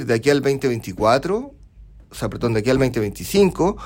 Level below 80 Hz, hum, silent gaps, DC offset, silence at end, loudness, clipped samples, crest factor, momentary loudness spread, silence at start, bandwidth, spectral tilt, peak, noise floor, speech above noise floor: -40 dBFS; none; none; under 0.1%; 0 s; -20 LUFS; under 0.1%; 16 dB; 11 LU; 0 s; 16.5 kHz; -6 dB/octave; -4 dBFS; -44 dBFS; 25 dB